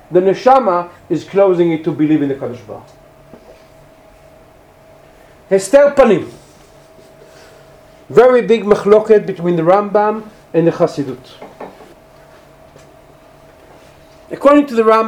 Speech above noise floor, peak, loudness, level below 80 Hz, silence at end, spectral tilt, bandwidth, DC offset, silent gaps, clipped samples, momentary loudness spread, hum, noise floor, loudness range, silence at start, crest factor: 32 dB; 0 dBFS; -13 LUFS; -50 dBFS; 0 s; -6.5 dB/octave; 13 kHz; under 0.1%; none; 0.2%; 22 LU; none; -44 dBFS; 10 LU; 0.1 s; 14 dB